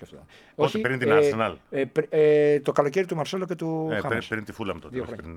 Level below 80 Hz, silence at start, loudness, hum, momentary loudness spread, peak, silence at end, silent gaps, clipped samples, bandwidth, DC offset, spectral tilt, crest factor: -58 dBFS; 0 s; -24 LUFS; none; 13 LU; -4 dBFS; 0 s; none; under 0.1%; 12.5 kHz; under 0.1%; -6 dB/octave; 20 dB